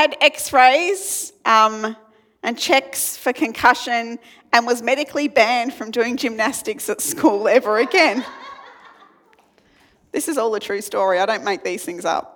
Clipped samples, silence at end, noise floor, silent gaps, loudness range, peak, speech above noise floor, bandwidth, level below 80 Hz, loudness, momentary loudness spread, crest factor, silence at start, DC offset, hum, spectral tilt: under 0.1%; 0.1 s; -56 dBFS; none; 6 LU; 0 dBFS; 37 dB; 19.5 kHz; -64 dBFS; -18 LUFS; 12 LU; 20 dB; 0 s; under 0.1%; none; -1.5 dB/octave